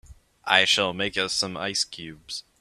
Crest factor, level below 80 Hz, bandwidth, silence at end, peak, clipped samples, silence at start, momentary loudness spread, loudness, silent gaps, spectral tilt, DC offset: 26 dB; -58 dBFS; 13.5 kHz; 0.2 s; -2 dBFS; under 0.1%; 0.1 s; 18 LU; -23 LUFS; none; -1.5 dB/octave; under 0.1%